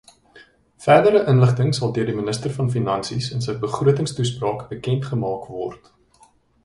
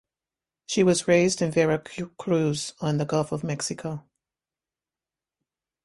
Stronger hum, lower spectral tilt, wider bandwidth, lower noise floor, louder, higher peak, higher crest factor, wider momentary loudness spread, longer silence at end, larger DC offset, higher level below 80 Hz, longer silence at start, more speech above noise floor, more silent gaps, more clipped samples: neither; first, -6.5 dB/octave vs -5 dB/octave; about the same, 11.5 kHz vs 11.5 kHz; second, -56 dBFS vs under -90 dBFS; first, -20 LUFS vs -25 LUFS; first, 0 dBFS vs -8 dBFS; about the same, 20 dB vs 20 dB; about the same, 12 LU vs 13 LU; second, 0.9 s vs 1.85 s; neither; first, -52 dBFS vs -62 dBFS; second, 0.35 s vs 0.7 s; second, 36 dB vs over 66 dB; neither; neither